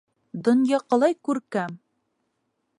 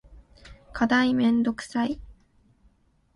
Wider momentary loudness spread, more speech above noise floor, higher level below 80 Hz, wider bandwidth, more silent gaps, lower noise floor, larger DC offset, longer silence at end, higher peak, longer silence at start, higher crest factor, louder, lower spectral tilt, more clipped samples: about the same, 11 LU vs 13 LU; first, 53 dB vs 40 dB; second, -78 dBFS vs -52 dBFS; about the same, 11 kHz vs 11 kHz; neither; first, -75 dBFS vs -63 dBFS; neither; about the same, 1 s vs 1.05 s; about the same, -8 dBFS vs -8 dBFS; first, 0.35 s vs 0.1 s; about the same, 18 dB vs 20 dB; about the same, -23 LUFS vs -24 LUFS; about the same, -6 dB/octave vs -5 dB/octave; neither